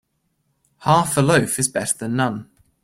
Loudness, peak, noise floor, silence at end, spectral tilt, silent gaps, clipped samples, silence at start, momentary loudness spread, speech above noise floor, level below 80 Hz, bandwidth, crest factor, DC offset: -19 LUFS; -2 dBFS; -69 dBFS; 0.4 s; -4.5 dB/octave; none; under 0.1%; 0.8 s; 8 LU; 51 dB; -52 dBFS; 16.5 kHz; 18 dB; under 0.1%